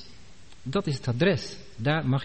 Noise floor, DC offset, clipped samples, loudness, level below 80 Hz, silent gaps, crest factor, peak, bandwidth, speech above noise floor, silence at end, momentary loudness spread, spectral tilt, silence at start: -51 dBFS; 0.6%; under 0.1%; -27 LUFS; -54 dBFS; none; 16 dB; -10 dBFS; 8.4 kHz; 25 dB; 0 s; 11 LU; -6.5 dB/octave; 0 s